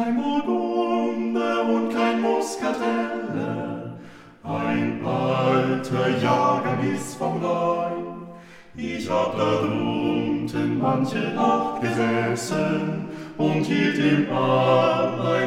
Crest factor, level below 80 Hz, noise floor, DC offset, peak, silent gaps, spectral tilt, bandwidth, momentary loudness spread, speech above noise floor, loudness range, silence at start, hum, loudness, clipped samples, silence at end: 16 dB; -60 dBFS; -43 dBFS; under 0.1%; -6 dBFS; none; -6 dB/octave; 15 kHz; 10 LU; 21 dB; 3 LU; 0 s; none; -23 LUFS; under 0.1%; 0 s